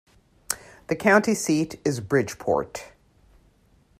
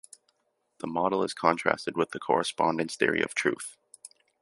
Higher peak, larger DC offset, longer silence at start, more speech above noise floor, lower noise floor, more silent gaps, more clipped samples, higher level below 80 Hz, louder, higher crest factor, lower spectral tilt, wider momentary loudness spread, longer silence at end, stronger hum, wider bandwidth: about the same, -2 dBFS vs -4 dBFS; neither; second, 0.5 s vs 0.85 s; second, 37 dB vs 48 dB; second, -60 dBFS vs -76 dBFS; neither; neither; first, -58 dBFS vs -70 dBFS; first, -24 LUFS vs -28 LUFS; about the same, 24 dB vs 26 dB; about the same, -4.5 dB/octave vs -4 dB/octave; about the same, 12 LU vs 12 LU; first, 1.15 s vs 0.35 s; neither; first, 15 kHz vs 11.5 kHz